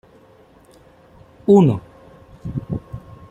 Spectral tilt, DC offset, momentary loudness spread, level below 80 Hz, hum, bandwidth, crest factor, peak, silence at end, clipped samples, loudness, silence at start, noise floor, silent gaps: -9.5 dB/octave; under 0.1%; 23 LU; -48 dBFS; none; 8 kHz; 20 dB; -2 dBFS; 0.3 s; under 0.1%; -18 LUFS; 1.5 s; -50 dBFS; none